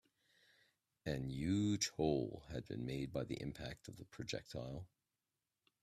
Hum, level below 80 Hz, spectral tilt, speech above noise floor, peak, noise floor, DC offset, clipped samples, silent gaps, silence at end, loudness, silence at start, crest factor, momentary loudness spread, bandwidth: none; -64 dBFS; -5 dB/octave; over 48 dB; -24 dBFS; under -90 dBFS; under 0.1%; under 0.1%; none; 0.95 s; -42 LUFS; 1.05 s; 20 dB; 13 LU; 14.5 kHz